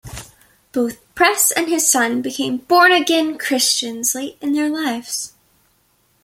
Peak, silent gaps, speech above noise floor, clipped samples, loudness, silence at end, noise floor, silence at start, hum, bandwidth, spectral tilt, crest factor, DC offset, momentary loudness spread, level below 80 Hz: -2 dBFS; none; 43 dB; under 0.1%; -17 LUFS; 0.95 s; -61 dBFS; 0.05 s; none; 16.5 kHz; -1 dB/octave; 18 dB; under 0.1%; 13 LU; -54 dBFS